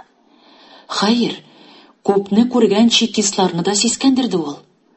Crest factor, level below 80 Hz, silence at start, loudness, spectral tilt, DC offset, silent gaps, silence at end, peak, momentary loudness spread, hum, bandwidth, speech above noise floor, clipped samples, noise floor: 18 dB; -62 dBFS; 0.9 s; -16 LUFS; -3.5 dB/octave; under 0.1%; none; 0.4 s; 0 dBFS; 11 LU; none; 8.6 kHz; 36 dB; under 0.1%; -51 dBFS